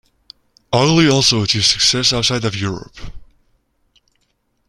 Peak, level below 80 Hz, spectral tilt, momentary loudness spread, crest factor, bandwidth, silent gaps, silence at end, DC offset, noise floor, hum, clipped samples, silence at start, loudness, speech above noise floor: 0 dBFS; -42 dBFS; -3.5 dB/octave; 12 LU; 18 dB; 13.5 kHz; none; 1.45 s; under 0.1%; -65 dBFS; none; under 0.1%; 0.7 s; -14 LUFS; 50 dB